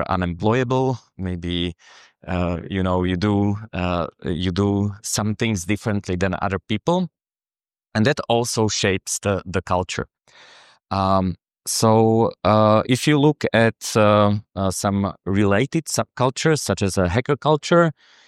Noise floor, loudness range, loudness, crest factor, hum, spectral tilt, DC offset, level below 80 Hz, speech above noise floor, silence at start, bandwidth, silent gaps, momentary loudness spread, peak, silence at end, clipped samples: under -90 dBFS; 6 LU; -21 LUFS; 18 dB; none; -5.5 dB/octave; under 0.1%; -46 dBFS; over 70 dB; 0 s; 14.5 kHz; none; 9 LU; -2 dBFS; 0.35 s; under 0.1%